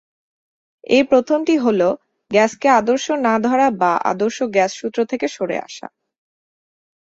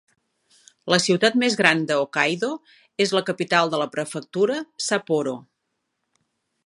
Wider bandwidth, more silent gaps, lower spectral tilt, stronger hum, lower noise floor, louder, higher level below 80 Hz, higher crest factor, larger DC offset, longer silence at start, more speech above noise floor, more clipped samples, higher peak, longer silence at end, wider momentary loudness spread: second, 8 kHz vs 11.5 kHz; neither; about the same, -4.5 dB/octave vs -3.5 dB/octave; neither; first, under -90 dBFS vs -77 dBFS; first, -17 LUFS vs -22 LUFS; first, -62 dBFS vs -72 dBFS; second, 18 dB vs 24 dB; neither; about the same, 0.9 s vs 0.85 s; first, over 73 dB vs 55 dB; neither; about the same, -2 dBFS vs 0 dBFS; about the same, 1.3 s vs 1.25 s; second, 9 LU vs 12 LU